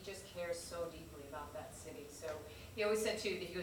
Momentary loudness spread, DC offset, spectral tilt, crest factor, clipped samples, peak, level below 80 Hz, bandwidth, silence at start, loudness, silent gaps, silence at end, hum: 14 LU; under 0.1%; -3.5 dB/octave; 18 dB; under 0.1%; -26 dBFS; -64 dBFS; over 20 kHz; 0 s; -43 LUFS; none; 0 s; none